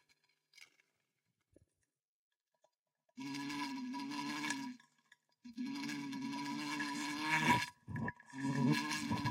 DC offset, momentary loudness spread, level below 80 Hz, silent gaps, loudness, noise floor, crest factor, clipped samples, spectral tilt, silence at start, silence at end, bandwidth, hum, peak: under 0.1%; 12 LU; -74 dBFS; 2.08-2.31 s, 2.79-2.84 s; -39 LUFS; -89 dBFS; 24 dB; under 0.1%; -4 dB/octave; 0.6 s; 0 s; 16 kHz; none; -18 dBFS